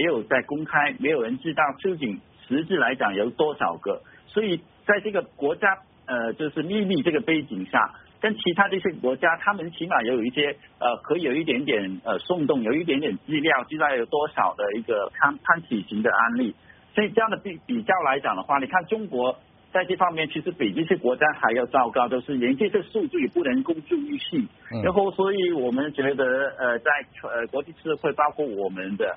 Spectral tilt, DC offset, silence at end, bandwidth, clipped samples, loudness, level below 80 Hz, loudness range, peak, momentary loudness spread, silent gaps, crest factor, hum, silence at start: -3 dB/octave; under 0.1%; 0 s; 4 kHz; under 0.1%; -24 LUFS; -64 dBFS; 2 LU; -4 dBFS; 7 LU; none; 22 dB; none; 0 s